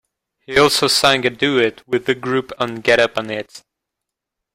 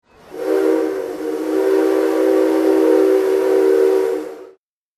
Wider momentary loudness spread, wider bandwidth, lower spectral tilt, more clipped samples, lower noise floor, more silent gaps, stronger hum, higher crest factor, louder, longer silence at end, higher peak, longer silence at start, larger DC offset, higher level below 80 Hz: about the same, 11 LU vs 10 LU; first, 16 kHz vs 14 kHz; second, -3 dB/octave vs -4.5 dB/octave; neither; first, -82 dBFS vs -49 dBFS; neither; neither; first, 18 dB vs 12 dB; about the same, -16 LUFS vs -16 LUFS; first, 0.95 s vs 0.5 s; first, 0 dBFS vs -4 dBFS; first, 0.5 s vs 0.3 s; neither; first, -54 dBFS vs -64 dBFS